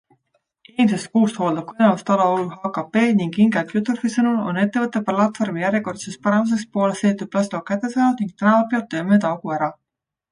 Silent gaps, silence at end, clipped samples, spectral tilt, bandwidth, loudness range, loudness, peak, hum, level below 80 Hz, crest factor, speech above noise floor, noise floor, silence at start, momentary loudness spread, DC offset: none; 0.6 s; under 0.1%; -6.5 dB/octave; 10.5 kHz; 2 LU; -20 LUFS; -4 dBFS; none; -66 dBFS; 16 dB; 50 dB; -69 dBFS; 0.8 s; 6 LU; under 0.1%